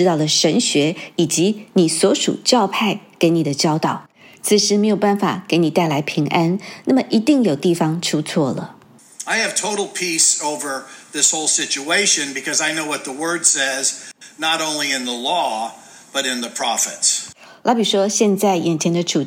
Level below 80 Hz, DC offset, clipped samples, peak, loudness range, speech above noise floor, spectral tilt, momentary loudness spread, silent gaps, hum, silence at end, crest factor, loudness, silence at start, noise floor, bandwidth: -74 dBFS; under 0.1%; under 0.1%; 0 dBFS; 3 LU; 20 dB; -3 dB/octave; 8 LU; none; none; 0 s; 18 dB; -17 LUFS; 0 s; -38 dBFS; 16.5 kHz